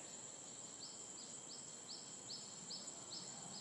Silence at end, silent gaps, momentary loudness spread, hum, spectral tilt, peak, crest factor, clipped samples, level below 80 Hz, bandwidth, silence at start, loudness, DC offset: 0 s; none; 3 LU; none; -1 dB/octave; -38 dBFS; 16 dB; under 0.1%; -90 dBFS; 12 kHz; 0 s; -50 LUFS; under 0.1%